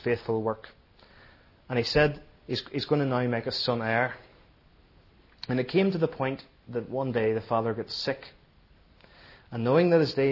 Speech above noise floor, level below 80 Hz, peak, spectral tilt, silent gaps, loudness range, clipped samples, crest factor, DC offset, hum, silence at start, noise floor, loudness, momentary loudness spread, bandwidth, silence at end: 32 dB; -54 dBFS; -8 dBFS; -7 dB/octave; none; 3 LU; under 0.1%; 20 dB; under 0.1%; none; 0 s; -59 dBFS; -28 LUFS; 13 LU; 6 kHz; 0 s